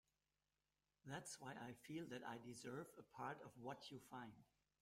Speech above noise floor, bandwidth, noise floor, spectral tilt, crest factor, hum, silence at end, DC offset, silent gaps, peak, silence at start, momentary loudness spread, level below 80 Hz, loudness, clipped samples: over 35 dB; 16 kHz; under -90 dBFS; -4.5 dB/octave; 20 dB; none; 0.35 s; under 0.1%; none; -38 dBFS; 1.05 s; 5 LU; -86 dBFS; -55 LUFS; under 0.1%